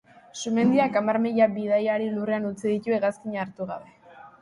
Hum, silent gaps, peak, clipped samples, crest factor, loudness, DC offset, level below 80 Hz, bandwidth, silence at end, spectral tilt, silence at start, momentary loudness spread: none; none; -10 dBFS; under 0.1%; 16 dB; -25 LUFS; under 0.1%; -68 dBFS; 11.5 kHz; 0.1 s; -6 dB/octave; 0.35 s; 13 LU